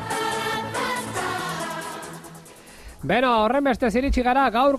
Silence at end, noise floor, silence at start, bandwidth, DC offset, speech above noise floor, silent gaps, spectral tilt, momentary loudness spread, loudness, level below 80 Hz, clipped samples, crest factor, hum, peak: 0 s; -44 dBFS; 0 s; 14.5 kHz; under 0.1%; 25 dB; none; -4.5 dB/octave; 18 LU; -23 LUFS; -38 dBFS; under 0.1%; 14 dB; none; -8 dBFS